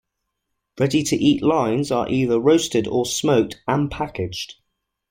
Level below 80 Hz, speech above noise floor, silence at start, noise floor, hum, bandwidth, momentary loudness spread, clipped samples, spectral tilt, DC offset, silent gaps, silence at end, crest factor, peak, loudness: -50 dBFS; 58 dB; 0.75 s; -78 dBFS; none; 16.5 kHz; 10 LU; under 0.1%; -5 dB/octave; under 0.1%; none; 0.6 s; 16 dB; -4 dBFS; -20 LUFS